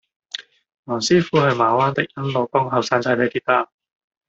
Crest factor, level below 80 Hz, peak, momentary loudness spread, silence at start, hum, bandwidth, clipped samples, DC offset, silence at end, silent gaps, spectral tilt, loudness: 18 dB; -60 dBFS; -2 dBFS; 16 LU; 0.35 s; none; 8 kHz; under 0.1%; under 0.1%; 0.65 s; 0.79-0.83 s; -5 dB/octave; -19 LUFS